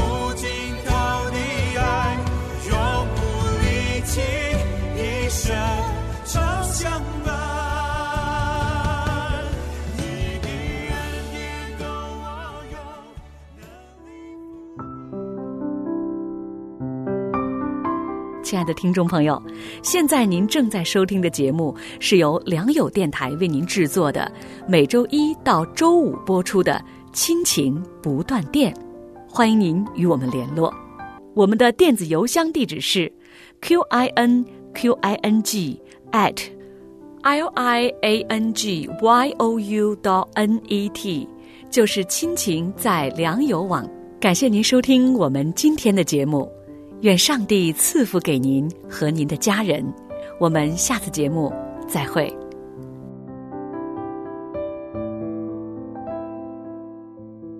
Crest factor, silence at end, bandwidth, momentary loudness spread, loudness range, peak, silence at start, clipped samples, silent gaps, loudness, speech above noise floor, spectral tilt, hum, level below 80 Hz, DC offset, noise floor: 18 dB; 0 s; 14 kHz; 16 LU; 12 LU; -4 dBFS; 0 s; under 0.1%; none; -21 LUFS; 25 dB; -4.5 dB/octave; none; -36 dBFS; under 0.1%; -44 dBFS